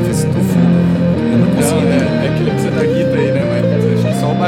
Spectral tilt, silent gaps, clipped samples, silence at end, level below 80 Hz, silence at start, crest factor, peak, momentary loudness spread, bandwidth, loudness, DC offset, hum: -7 dB/octave; none; under 0.1%; 0 s; -42 dBFS; 0 s; 12 dB; 0 dBFS; 3 LU; 15 kHz; -13 LUFS; under 0.1%; none